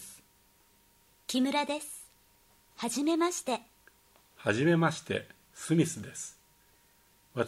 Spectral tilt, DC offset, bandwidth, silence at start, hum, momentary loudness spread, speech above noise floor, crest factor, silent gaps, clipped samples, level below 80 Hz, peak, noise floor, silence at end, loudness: -5 dB/octave; under 0.1%; 16 kHz; 0 s; 50 Hz at -70 dBFS; 17 LU; 35 dB; 22 dB; none; under 0.1%; -72 dBFS; -12 dBFS; -65 dBFS; 0 s; -31 LUFS